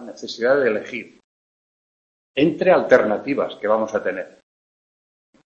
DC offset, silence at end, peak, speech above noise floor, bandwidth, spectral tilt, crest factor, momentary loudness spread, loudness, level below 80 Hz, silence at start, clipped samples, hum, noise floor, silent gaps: under 0.1%; 1.2 s; 0 dBFS; over 71 dB; 7.4 kHz; -6 dB/octave; 22 dB; 16 LU; -19 LUFS; -62 dBFS; 0 s; under 0.1%; none; under -90 dBFS; 1.24-2.34 s